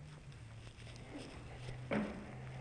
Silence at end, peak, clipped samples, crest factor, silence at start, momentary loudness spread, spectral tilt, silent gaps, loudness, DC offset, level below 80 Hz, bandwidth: 0 s; -26 dBFS; under 0.1%; 20 dB; 0 s; 14 LU; -6.5 dB/octave; none; -47 LUFS; under 0.1%; -60 dBFS; 10.5 kHz